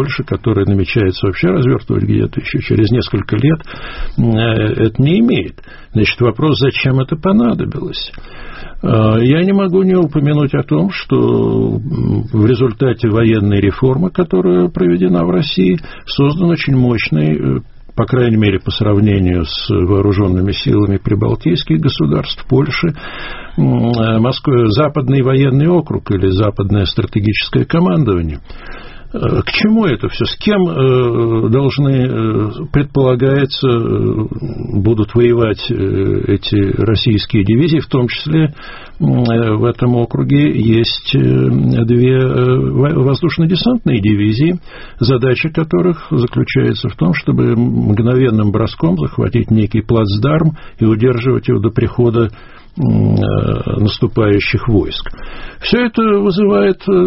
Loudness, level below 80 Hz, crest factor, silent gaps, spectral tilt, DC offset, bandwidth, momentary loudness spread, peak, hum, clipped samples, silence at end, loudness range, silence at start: -13 LUFS; -32 dBFS; 12 dB; none; -6.5 dB/octave; under 0.1%; 5.8 kHz; 6 LU; 0 dBFS; none; under 0.1%; 0 s; 2 LU; 0 s